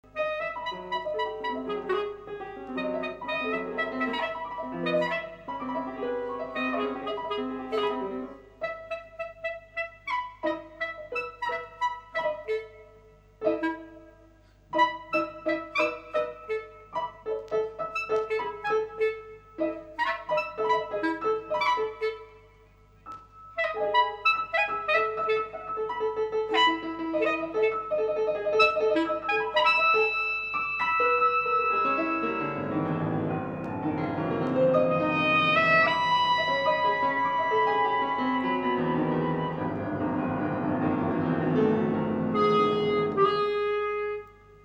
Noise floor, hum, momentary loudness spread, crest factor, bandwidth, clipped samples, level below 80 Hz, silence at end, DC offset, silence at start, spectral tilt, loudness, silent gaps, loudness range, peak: -56 dBFS; none; 12 LU; 18 dB; 8.4 kHz; under 0.1%; -60 dBFS; 0.1 s; under 0.1%; 0.15 s; -6 dB/octave; -27 LUFS; none; 9 LU; -10 dBFS